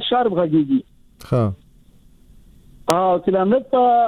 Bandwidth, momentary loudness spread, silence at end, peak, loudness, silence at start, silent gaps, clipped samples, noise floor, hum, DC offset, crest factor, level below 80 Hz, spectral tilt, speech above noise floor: over 20 kHz; 7 LU; 0 s; 0 dBFS; -19 LUFS; 0 s; none; under 0.1%; -49 dBFS; none; under 0.1%; 20 dB; -50 dBFS; -6.5 dB/octave; 32 dB